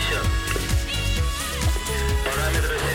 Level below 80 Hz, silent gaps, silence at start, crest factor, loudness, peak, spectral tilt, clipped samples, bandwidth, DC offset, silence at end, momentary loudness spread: -26 dBFS; none; 0 s; 14 dB; -24 LUFS; -10 dBFS; -3.5 dB/octave; under 0.1%; 17 kHz; under 0.1%; 0 s; 2 LU